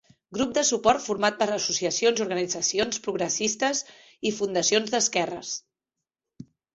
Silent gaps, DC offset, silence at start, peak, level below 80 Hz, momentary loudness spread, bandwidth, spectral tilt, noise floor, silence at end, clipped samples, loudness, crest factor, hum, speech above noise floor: none; under 0.1%; 0.3 s; -6 dBFS; -62 dBFS; 9 LU; 8.2 kHz; -2 dB/octave; -87 dBFS; 0.3 s; under 0.1%; -25 LUFS; 22 dB; none; 62 dB